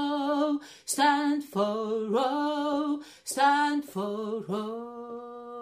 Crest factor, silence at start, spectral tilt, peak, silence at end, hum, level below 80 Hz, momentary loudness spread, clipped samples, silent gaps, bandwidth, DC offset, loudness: 18 dB; 0 s; -3.5 dB/octave; -12 dBFS; 0 s; none; -76 dBFS; 15 LU; under 0.1%; none; 15.5 kHz; under 0.1%; -28 LUFS